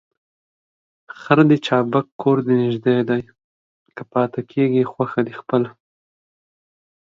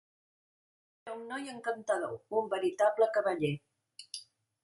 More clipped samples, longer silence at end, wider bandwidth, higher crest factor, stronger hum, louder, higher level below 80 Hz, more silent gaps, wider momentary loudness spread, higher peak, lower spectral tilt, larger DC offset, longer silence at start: neither; first, 1.3 s vs 0.4 s; second, 7.6 kHz vs 11.5 kHz; about the same, 20 dB vs 20 dB; neither; first, -19 LUFS vs -33 LUFS; first, -64 dBFS vs -78 dBFS; first, 2.12-2.19 s, 3.44-3.86 s vs none; second, 9 LU vs 17 LU; first, 0 dBFS vs -16 dBFS; first, -8 dB/octave vs -5 dB/octave; neither; about the same, 1.15 s vs 1.05 s